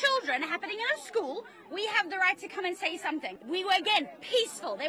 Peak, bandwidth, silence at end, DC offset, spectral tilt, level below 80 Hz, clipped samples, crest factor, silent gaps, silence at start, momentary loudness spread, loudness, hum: -12 dBFS; 13 kHz; 0 s; under 0.1%; -1 dB/octave; -86 dBFS; under 0.1%; 18 dB; none; 0 s; 9 LU; -30 LUFS; none